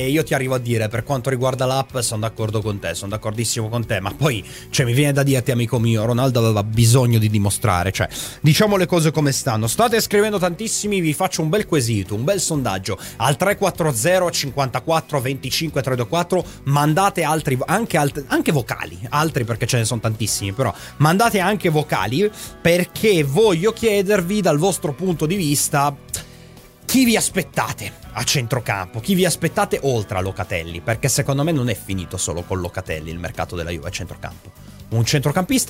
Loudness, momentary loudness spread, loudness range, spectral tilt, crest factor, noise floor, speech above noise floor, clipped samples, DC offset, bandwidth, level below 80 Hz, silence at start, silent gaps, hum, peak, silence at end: -19 LUFS; 9 LU; 5 LU; -5 dB/octave; 18 dB; -43 dBFS; 24 dB; under 0.1%; under 0.1%; 16 kHz; -44 dBFS; 0 s; none; none; -2 dBFS; 0 s